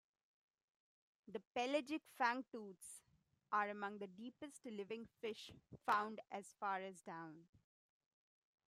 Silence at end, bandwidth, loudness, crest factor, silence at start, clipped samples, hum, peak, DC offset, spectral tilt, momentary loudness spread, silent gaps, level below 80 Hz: 1.3 s; 15 kHz; -45 LUFS; 24 dB; 1.25 s; under 0.1%; none; -24 dBFS; under 0.1%; -4 dB/octave; 14 LU; 1.47-1.55 s, 2.48-2.52 s; -88 dBFS